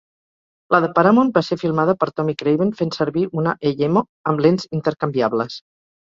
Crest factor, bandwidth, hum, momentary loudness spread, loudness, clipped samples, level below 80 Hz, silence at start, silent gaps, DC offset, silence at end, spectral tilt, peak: 18 dB; 7.6 kHz; none; 7 LU; -19 LUFS; under 0.1%; -60 dBFS; 0.7 s; 4.09-4.24 s; under 0.1%; 0.5 s; -7.5 dB/octave; 0 dBFS